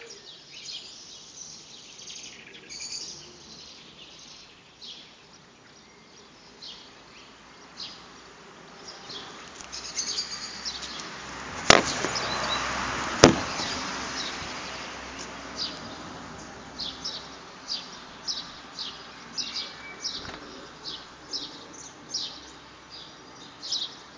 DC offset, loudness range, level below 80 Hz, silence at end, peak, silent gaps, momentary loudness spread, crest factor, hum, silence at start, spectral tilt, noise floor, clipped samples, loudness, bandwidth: under 0.1%; 21 LU; -52 dBFS; 0 s; 0 dBFS; none; 19 LU; 32 dB; none; 0 s; -2.5 dB/octave; -52 dBFS; under 0.1%; -29 LUFS; 8 kHz